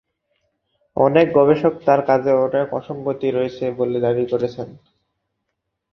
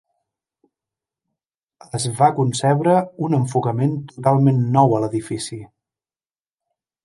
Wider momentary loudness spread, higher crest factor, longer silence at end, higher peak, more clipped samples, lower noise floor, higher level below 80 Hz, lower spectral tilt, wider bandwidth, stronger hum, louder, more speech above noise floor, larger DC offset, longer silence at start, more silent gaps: about the same, 11 LU vs 12 LU; about the same, 18 dB vs 20 dB; second, 1.2 s vs 1.4 s; about the same, -2 dBFS vs 0 dBFS; neither; second, -77 dBFS vs under -90 dBFS; about the same, -58 dBFS vs -60 dBFS; first, -8.5 dB/octave vs -6.5 dB/octave; second, 6.2 kHz vs 11.5 kHz; neither; about the same, -18 LUFS vs -19 LUFS; second, 59 dB vs over 72 dB; neither; second, 0.95 s vs 1.95 s; neither